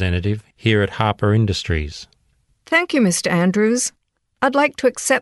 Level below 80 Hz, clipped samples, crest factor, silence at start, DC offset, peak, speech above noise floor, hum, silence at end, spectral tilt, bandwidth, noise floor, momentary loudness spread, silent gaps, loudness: -38 dBFS; under 0.1%; 16 dB; 0 s; under 0.1%; -2 dBFS; 44 dB; none; 0 s; -5 dB/octave; 12 kHz; -62 dBFS; 7 LU; none; -18 LUFS